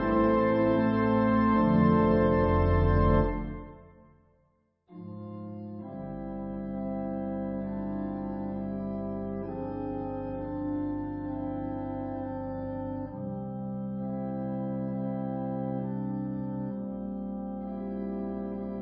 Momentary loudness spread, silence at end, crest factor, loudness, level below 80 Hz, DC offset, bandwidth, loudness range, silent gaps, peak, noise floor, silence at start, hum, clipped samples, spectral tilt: 13 LU; 0 s; 18 dB; -30 LUFS; -40 dBFS; under 0.1%; 5.6 kHz; 12 LU; none; -12 dBFS; -70 dBFS; 0 s; none; under 0.1%; -12 dB/octave